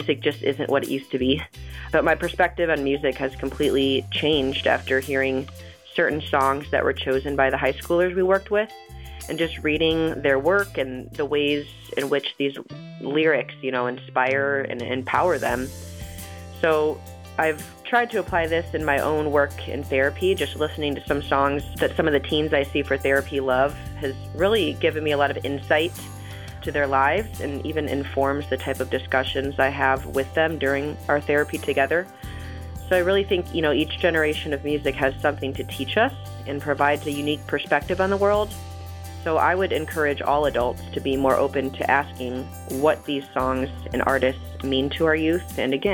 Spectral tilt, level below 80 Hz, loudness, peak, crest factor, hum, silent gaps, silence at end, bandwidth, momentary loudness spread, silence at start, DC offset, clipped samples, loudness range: -5.5 dB/octave; -42 dBFS; -23 LUFS; -6 dBFS; 18 dB; none; none; 0 s; 17.5 kHz; 10 LU; 0 s; under 0.1%; under 0.1%; 2 LU